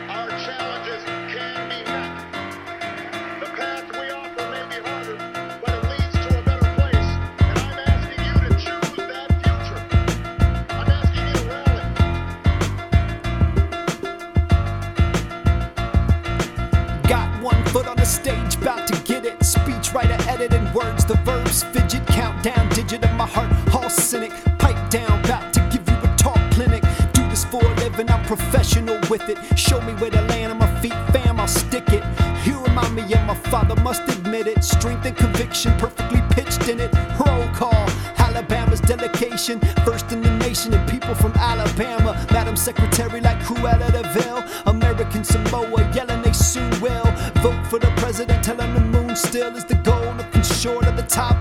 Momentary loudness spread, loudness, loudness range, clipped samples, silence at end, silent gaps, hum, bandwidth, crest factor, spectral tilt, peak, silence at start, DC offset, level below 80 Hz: 9 LU; -20 LUFS; 3 LU; under 0.1%; 0 s; none; none; 16.5 kHz; 18 dB; -5 dB/octave; 0 dBFS; 0 s; under 0.1%; -24 dBFS